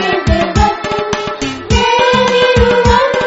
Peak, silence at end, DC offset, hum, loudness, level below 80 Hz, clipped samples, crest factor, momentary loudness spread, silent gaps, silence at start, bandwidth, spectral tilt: 0 dBFS; 0 s; under 0.1%; none; -12 LUFS; -22 dBFS; under 0.1%; 12 dB; 8 LU; none; 0 s; 8 kHz; -5 dB/octave